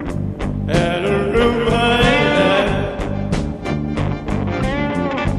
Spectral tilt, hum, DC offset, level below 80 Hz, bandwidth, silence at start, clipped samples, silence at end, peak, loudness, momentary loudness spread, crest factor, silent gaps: -6 dB/octave; none; under 0.1%; -28 dBFS; 12.5 kHz; 0 s; under 0.1%; 0 s; -2 dBFS; -18 LUFS; 9 LU; 16 dB; none